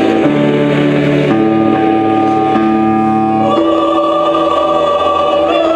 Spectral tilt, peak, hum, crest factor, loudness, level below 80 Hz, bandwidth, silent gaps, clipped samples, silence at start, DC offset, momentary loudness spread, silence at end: -7.5 dB/octave; 0 dBFS; none; 10 dB; -11 LUFS; -46 dBFS; 9 kHz; none; under 0.1%; 0 s; under 0.1%; 1 LU; 0 s